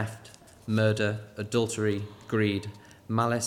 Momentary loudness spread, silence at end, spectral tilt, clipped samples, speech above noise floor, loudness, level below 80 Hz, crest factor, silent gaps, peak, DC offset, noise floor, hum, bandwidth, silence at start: 18 LU; 0 s; -5.5 dB/octave; under 0.1%; 24 dB; -29 LUFS; -64 dBFS; 18 dB; none; -12 dBFS; under 0.1%; -51 dBFS; none; 13.5 kHz; 0 s